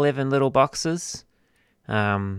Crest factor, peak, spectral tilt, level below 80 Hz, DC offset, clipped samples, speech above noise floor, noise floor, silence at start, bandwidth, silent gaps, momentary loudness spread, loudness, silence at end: 20 dB; -4 dBFS; -5 dB/octave; -56 dBFS; under 0.1%; under 0.1%; 42 dB; -65 dBFS; 0 s; 14.5 kHz; none; 11 LU; -23 LUFS; 0 s